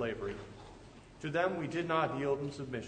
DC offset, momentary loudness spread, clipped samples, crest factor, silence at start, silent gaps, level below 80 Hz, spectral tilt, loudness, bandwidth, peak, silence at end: under 0.1%; 20 LU; under 0.1%; 18 dB; 0 s; none; -60 dBFS; -6.5 dB/octave; -35 LUFS; 9.4 kHz; -18 dBFS; 0 s